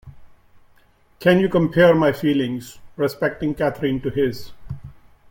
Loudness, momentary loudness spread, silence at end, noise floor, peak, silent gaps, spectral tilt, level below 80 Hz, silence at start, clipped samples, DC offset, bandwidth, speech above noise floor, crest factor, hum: -19 LUFS; 22 LU; 0.4 s; -55 dBFS; -2 dBFS; none; -7 dB/octave; -48 dBFS; 0.05 s; under 0.1%; under 0.1%; 17 kHz; 36 dB; 18 dB; none